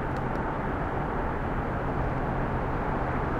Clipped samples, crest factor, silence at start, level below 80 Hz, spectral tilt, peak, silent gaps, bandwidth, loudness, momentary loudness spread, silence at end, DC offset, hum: under 0.1%; 12 dB; 0 s; -36 dBFS; -8.5 dB/octave; -16 dBFS; none; 8.6 kHz; -30 LUFS; 1 LU; 0 s; under 0.1%; none